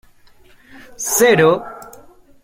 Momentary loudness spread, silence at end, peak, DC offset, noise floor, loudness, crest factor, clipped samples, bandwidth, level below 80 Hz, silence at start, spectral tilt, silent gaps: 23 LU; 0.6 s; -2 dBFS; under 0.1%; -47 dBFS; -14 LUFS; 18 dB; under 0.1%; 16.5 kHz; -54 dBFS; 1 s; -3.5 dB/octave; none